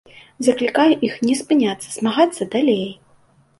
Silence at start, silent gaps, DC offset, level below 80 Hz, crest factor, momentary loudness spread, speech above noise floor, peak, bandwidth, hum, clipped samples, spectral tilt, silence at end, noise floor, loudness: 0.4 s; none; under 0.1%; -64 dBFS; 18 dB; 6 LU; 37 dB; -2 dBFS; 11.5 kHz; none; under 0.1%; -4.5 dB/octave; 0.65 s; -55 dBFS; -18 LUFS